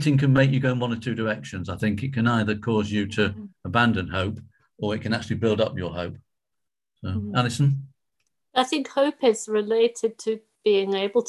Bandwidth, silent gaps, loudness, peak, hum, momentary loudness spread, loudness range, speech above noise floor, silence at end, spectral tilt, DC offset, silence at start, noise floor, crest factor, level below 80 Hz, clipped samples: 12 kHz; none; -24 LUFS; -6 dBFS; none; 10 LU; 4 LU; 62 dB; 0 s; -6 dB/octave; under 0.1%; 0 s; -86 dBFS; 18 dB; -48 dBFS; under 0.1%